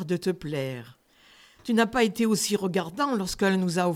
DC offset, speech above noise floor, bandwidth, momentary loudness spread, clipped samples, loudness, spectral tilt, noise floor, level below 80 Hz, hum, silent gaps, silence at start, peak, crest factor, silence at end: under 0.1%; 31 dB; 16.5 kHz; 8 LU; under 0.1%; -26 LUFS; -4.5 dB/octave; -57 dBFS; -56 dBFS; none; none; 0 s; -8 dBFS; 18 dB; 0 s